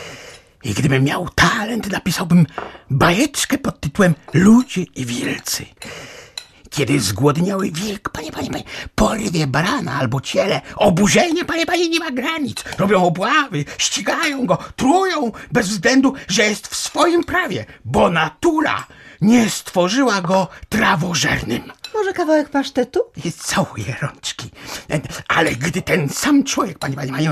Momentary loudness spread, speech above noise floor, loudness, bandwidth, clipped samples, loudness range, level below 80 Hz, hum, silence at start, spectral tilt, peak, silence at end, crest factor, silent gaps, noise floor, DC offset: 11 LU; 22 dB; -18 LUFS; 14.5 kHz; under 0.1%; 4 LU; -42 dBFS; none; 0 s; -4.5 dB/octave; -2 dBFS; 0 s; 16 dB; none; -40 dBFS; under 0.1%